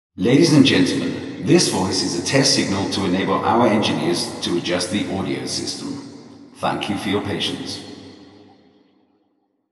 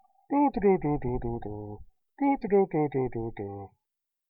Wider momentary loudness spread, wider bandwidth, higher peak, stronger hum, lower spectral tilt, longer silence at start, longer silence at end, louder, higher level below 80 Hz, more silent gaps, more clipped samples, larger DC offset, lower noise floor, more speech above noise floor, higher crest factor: about the same, 14 LU vs 16 LU; first, 12.5 kHz vs 4.9 kHz; first, 0 dBFS vs -12 dBFS; neither; second, -4.5 dB/octave vs -12.5 dB/octave; second, 0.15 s vs 0.3 s; first, 1.5 s vs 0.65 s; first, -19 LUFS vs -28 LUFS; second, -62 dBFS vs -48 dBFS; neither; neither; neither; second, -66 dBFS vs -86 dBFS; second, 48 dB vs 58 dB; about the same, 20 dB vs 16 dB